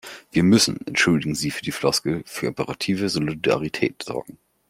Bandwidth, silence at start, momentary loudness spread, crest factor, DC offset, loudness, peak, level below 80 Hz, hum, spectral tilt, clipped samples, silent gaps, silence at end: 16.5 kHz; 0.05 s; 10 LU; 20 dB; under 0.1%; -22 LUFS; -4 dBFS; -54 dBFS; none; -4.5 dB/octave; under 0.1%; none; 0.35 s